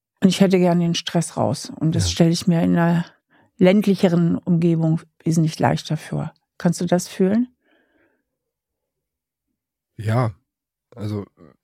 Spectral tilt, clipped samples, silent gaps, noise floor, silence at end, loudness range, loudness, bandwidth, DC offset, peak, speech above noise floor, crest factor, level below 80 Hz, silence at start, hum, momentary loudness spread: -6.5 dB/octave; under 0.1%; none; -83 dBFS; 0.4 s; 11 LU; -20 LUFS; 14.5 kHz; under 0.1%; -2 dBFS; 64 dB; 20 dB; -52 dBFS; 0.2 s; none; 13 LU